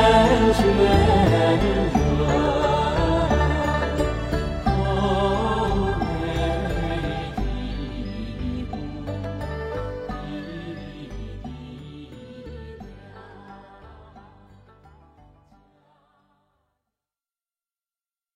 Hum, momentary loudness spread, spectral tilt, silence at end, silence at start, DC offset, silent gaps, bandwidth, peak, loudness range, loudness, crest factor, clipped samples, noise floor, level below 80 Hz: 50 Hz at -45 dBFS; 22 LU; -6.5 dB/octave; 4.15 s; 0 s; under 0.1%; none; 13.5 kHz; -6 dBFS; 21 LU; -22 LUFS; 18 dB; under 0.1%; under -90 dBFS; -32 dBFS